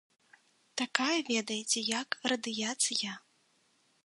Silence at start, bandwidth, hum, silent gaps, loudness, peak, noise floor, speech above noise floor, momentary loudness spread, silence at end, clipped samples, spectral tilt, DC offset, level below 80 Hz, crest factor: 0.75 s; 11.5 kHz; none; none; -32 LUFS; -8 dBFS; -71 dBFS; 38 dB; 8 LU; 0.85 s; under 0.1%; -1 dB/octave; under 0.1%; -84 dBFS; 28 dB